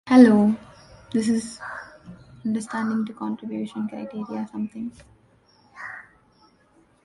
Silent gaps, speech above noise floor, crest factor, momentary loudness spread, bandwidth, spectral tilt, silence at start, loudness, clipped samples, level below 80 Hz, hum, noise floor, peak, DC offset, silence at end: none; 38 dB; 22 dB; 20 LU; 11.5 kHz; -6.5 dB/octave; 0.05 s; -23 LUFS; under 0.1%; -62 dBFS; none; -60 dBFS; -2 dBFS; under 0.1%; 1.05 s